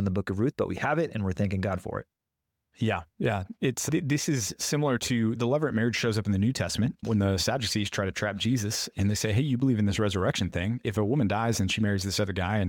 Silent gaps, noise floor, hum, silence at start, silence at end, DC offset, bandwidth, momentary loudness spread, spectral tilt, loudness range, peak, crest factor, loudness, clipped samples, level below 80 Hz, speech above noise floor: none; -84 dBFS; none; 0 s; 0 s; under 0.1%; 17.5 kHz; 4 LU; -5 dB/octave; 3 LU; -14 dBFS; 14 dB; -28 LUFS; under 0.1%; -54 dBFS; 57 dB